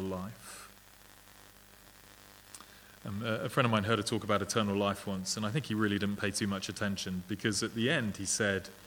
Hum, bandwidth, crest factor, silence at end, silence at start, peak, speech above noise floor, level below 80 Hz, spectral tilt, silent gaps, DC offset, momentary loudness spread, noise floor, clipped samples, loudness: 50 Hz at -55 dBFS; over 20 kHz; 24 dB; 0 s; 0 s; -12 dBFS; 24 dB; -66 dBFS; -4 dB/octave; none; under 0.1%; 20 LU; -57 dBFS; under 0.1%; -33 LUFS